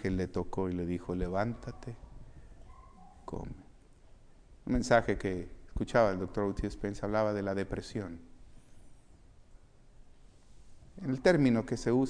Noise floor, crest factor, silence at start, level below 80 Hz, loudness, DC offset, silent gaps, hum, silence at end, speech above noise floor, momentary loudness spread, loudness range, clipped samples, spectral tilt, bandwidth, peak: -57 dBFS; 24 dB; 0 s; -48 dBFS; -32 LUFS; under 0.1%; none; none; 0 s; 25 dB; 19 LU; 14 LU; under 0.1%; -6.5 dB/octave; 10.5 kHz; -10 dBFS